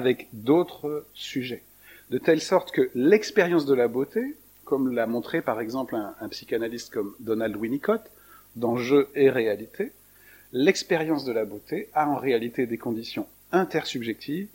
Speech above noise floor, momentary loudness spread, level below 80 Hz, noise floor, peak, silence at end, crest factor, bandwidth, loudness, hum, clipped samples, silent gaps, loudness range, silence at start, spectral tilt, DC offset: 28 dB; 12 LU; -66 dBFS; -53 dBFS; -4 dBFS; 0.1 s; 22 dB; 17 kHz; -26 LUFS; none; under 0.1%; none; 5 LU; 0 s; -5.5 dB/octave; under 0.1%